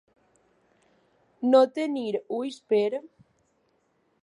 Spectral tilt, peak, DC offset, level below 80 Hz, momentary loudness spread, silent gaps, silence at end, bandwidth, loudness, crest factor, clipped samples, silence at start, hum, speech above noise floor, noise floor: -5.5 dB/octave; -8 dBFS; under 0.1%; -82 dBFS; 12 LU; none; 1.2 s; 10.5 kHz; -26 LUFS; 22 dB; under 0.1%; 1.4 s; none; 45 dB; -70 dBFS